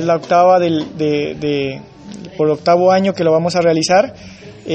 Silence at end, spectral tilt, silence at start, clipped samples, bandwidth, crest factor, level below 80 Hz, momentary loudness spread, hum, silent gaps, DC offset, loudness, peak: 0 s; -5.5 dB/octave; 0 s; under 0.1%; 8.4 kHz; 14 dB; -52 dBFS; 19 LU; none; none; under 0.1%; -14 LUFS; 0 dBFS